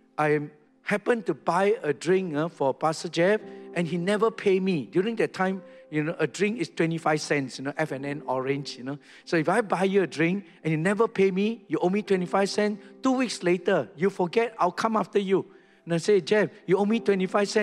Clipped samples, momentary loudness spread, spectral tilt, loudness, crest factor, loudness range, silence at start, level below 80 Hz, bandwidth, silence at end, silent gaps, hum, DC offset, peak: under 0.1%; 6 LU; -6 dB/octave; -26 LUFS; 18 dB; 3 LU; 0.2 s; -74 dBFS; 12 kHz; 0 s; none; none; under 0.1%; -8 dBFS